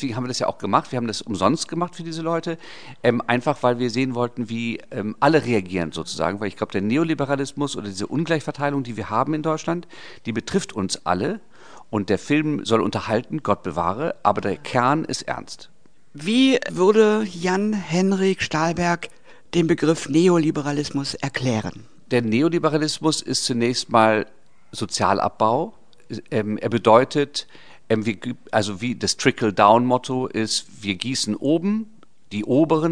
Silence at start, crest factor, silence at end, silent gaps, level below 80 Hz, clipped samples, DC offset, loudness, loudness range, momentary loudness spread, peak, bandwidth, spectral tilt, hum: 0 s; 22 dB; 0 s; none; -56 dBFS; under 0.1%; 0.7%; -22 LUFS; 4 LU; 11 LU; 0 dBFS; 10 kHz; -5 dB/octave; none